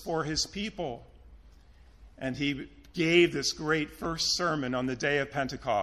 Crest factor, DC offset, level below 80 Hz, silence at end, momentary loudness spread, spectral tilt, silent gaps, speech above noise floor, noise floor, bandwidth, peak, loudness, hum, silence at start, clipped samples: 22 dB; under 0.1%; -54 dBFS; 0 s; 14 LU; -4 dB/octave; none; 26 dB; -56 dBFS; 14 kHz; -10 dBFS; -29 LUFS; none; 0 s; under 0.1%